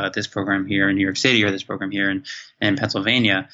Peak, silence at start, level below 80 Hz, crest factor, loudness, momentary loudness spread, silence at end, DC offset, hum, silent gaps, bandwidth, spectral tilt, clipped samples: -4 dBFS; 0 s; -62 dBFS; 18 dB; -20 LUFS; 9 LU; 0.1 s; under 0.1%; none; none; 8 kHz; -4.5 dB/octave; under 0.1%